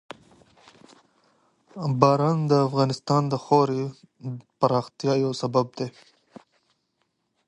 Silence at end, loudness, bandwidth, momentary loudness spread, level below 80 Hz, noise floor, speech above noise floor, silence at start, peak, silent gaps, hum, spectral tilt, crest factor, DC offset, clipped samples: 1.55 s; -24 LUFS; 10 kHz; 17 LU; -66 dBFS; -74 dBFS; 51 dB; 1.75 s; -2 dBFS; none; none; -7 dB/octave; 24 dB; under 0.1%; under 0.1%